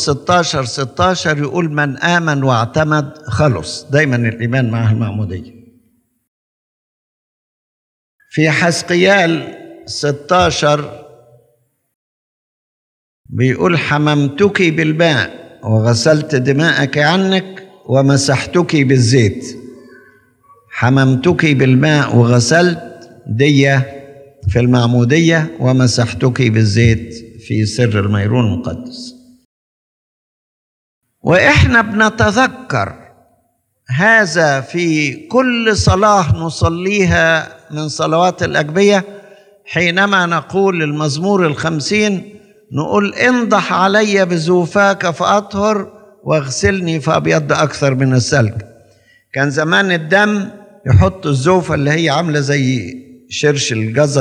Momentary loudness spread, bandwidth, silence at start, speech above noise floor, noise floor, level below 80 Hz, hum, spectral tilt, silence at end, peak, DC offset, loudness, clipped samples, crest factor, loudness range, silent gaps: 11 LU; 10.5 kHz; 0 s; 49 dB; -62 dBFS; -42 dBFS; none; -5.5 dB/octave; 0 s; 0 dBFS; under 0.1%; -13 LUFS; under 0.1%; 14 dB; 6 LU; 6.28-8.19 s, 11.95-13.24 s, 29.45-31.01 s